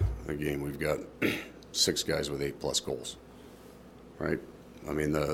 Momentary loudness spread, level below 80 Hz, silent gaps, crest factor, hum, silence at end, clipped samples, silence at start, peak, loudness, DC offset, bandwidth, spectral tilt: 24 LU; -46 dBFS; none; 20 dB; none; 0 s; under 0.1%; 0 s; -14 dBFS; -32 LUFS; under 0.1%; 17 kHz; -4 dB/octave